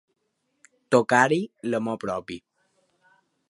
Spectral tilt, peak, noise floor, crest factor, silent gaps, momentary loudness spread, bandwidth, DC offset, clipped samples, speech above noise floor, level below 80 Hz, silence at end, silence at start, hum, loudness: -5 dB/octave; -4 dBFS; -75 dBFS; 22 dB; none; 15 LU; 11.5 kHz; under 0.1%; under 0.1%; 52 dB; -68 dBFS; 1.1 s; 0.9 s; none; -24 LUFS